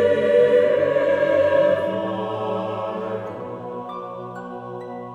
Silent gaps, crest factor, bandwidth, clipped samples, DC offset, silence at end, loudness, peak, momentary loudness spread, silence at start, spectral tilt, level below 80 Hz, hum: none; 14 dB; 8 kHz; under 0.1%; under 0.1%; 0 s; -20 LUFS; -6 dBFS; 17 LU; 0 s; -7 dB/octave; -66 dBFS; none